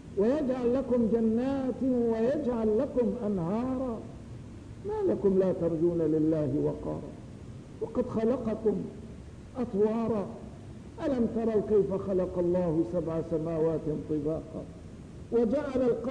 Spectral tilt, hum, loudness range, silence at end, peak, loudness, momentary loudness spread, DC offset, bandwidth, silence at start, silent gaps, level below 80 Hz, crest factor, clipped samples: -9 dB/octave; none; 4 LU; 0 s; -16 dBFS; -29 LUFS; 18 LU; under 0.1%; 10 kHz; 0 s; none; -52 dBFS; 14 dB; under 0.1%